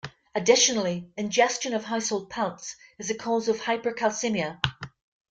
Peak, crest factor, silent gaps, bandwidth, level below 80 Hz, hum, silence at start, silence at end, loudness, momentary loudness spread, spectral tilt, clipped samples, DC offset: -2 dBFS; 24 dB; none; 10 kHz; -60 dBFS; none; 0.05 s; 0.4 s; -26 LUFS; 14 LU; -2.5 dB/octave; under 0.1%; under 0.1%